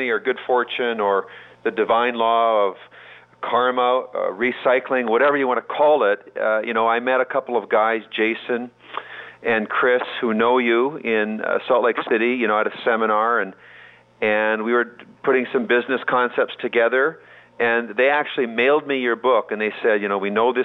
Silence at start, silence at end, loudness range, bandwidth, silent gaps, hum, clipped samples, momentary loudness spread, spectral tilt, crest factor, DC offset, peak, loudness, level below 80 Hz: 0 s; 0 s; 2 LU; 4.3 kHz; none; none; under 0.1%; 7 LU; -7 dB/octave; 14 dB; under 0.1%; -6 dBFS; -20 LUFS; -72 dBFS